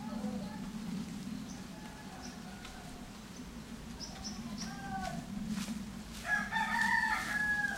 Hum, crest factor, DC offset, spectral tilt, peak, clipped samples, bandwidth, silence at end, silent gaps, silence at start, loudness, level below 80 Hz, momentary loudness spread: none; 20 dB; under 0.1%; -3.5 dB/octave; -18 dBFS; under 0.1%; 16 kHz; 0 s; none; 0 s; -38 LUFS; -56 dBFS; 16 LU